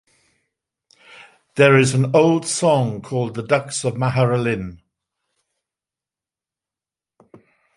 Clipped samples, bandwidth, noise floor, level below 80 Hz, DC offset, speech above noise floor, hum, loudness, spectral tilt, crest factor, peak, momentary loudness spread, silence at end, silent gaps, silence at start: under 0.1%; 11.5 kHz; -90 dBFS; -56 dBFS; under 0.1%; 72 dB; none; -18 LUFS; -5.5 dB/octave; 20 dB; -2 dBFS; 11 LU; 3 s; none; 1.55 s